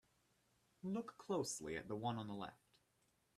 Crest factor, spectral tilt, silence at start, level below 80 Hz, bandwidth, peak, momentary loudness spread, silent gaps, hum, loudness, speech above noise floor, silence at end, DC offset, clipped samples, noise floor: 18 dB; -4.5 dB/octave; 0.85 s; -78 dBFS; 13.5 kHz; -30 dBFS; 9 LU; none; none; -46 LUFS; 35 dB; 0.85 s; under 0.1%; under 0.1%; -81 dBFS